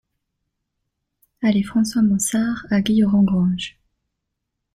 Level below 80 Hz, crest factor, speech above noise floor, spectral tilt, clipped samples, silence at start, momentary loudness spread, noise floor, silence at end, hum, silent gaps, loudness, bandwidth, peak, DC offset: -50 dBFS; 14 dB; 61 dB; -5.5 dB/octave; under 0.1%; 1.4 s; 6 LU; -79 dBFS; 1.05 s; none; none; -19 LUFS; 14.5 kHz; -6 dBFS; under 0.1%